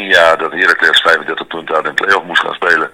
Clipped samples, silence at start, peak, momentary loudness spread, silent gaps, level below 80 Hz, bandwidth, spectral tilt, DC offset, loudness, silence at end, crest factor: 1%; 0 s; 0 dBFS; 9 LU; none; -52 dBFS; over 20 kHz; -2 dB/octave; under 0.1%; -11 LUFS; 0.05 s; 12 dB